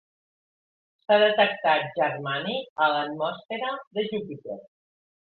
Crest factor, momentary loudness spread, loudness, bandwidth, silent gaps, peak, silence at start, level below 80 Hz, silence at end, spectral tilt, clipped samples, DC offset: 20 dB; 16 LU; -25 LUFS; 4.6 kHz; 2.70-2.76 s, 3.45-3.49 s, 3.87-3.91 s; -8 dBFS; 1.1 s; -74 dBFS; 0.7 s; -8 dB/octave; under 0.1%; under 0.1%